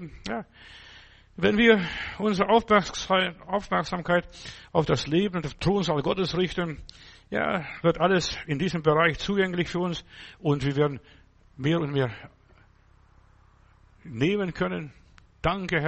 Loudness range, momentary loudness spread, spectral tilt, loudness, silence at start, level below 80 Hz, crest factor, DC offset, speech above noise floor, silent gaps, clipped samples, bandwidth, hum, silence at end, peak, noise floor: 8 LU; 15 LU; -5.5 dB/octave; -26 LUFS; 0 s; -48 dBFS; 20 dB; under 0.1%; 32 dB; none; under 0.1%; 8.4 kHz; none; 0 s; -6 dBFS; -58 dBFS